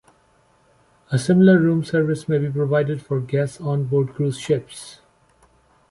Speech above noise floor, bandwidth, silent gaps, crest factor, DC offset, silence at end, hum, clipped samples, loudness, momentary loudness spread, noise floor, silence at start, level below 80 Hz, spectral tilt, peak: 39 dB; 11.5 kHz; none; 18 dB; under 0.1%; 0.95 s; none; under 0.1%; -20 LUFS; 11 LU; -59 dBFS; 1.1 s; -58 dBFS; -7.5 dB/octave; -4 dBFS